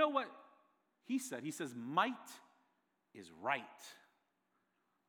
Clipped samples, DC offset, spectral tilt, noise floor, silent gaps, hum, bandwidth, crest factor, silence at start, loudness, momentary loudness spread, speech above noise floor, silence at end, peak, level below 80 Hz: under 0.1%; under 0.1%; -3.5 dB/octave; -82 dBFS; none; none; over 20 kHz; 24 dB; 0 s; -40 LUFS; 22 LU; 41 dB; 1.1 s; -20 dBFS; under -90 dBFS